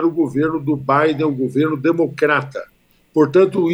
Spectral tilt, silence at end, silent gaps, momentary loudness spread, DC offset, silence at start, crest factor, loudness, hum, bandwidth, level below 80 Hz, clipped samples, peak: -8 dB/octave; 0 s; none; 7 LU; under 0.1%; 0 s; 14 dB; -17 LUFS; none; 10.5 kHz; -58 dBFS; under 0.1%; -2 dBFS